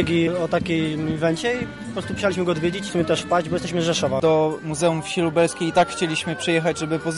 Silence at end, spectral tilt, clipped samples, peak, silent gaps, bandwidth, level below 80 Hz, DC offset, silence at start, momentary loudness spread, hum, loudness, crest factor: 0 s; -5 dB/octave; under 0.1%; -8 dBFS; none; 11.5 kHz; -50 dBFS; 0.1%; 0 s; 5 LU; none; -22 LUFS; 14 dB